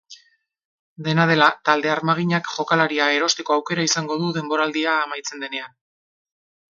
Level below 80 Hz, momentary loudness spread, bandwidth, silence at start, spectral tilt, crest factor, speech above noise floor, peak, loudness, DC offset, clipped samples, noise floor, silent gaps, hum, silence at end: -70 dBFS; 12 LU; 7.6 kHz; 0.1 s; -4 dB/octave; 22 dB; 39 dB; 0 dBFS; -20 LUFS; under 0.1%; under 0.1%; -59 dBFS; 0.65-0.96 s; none; 1.05 s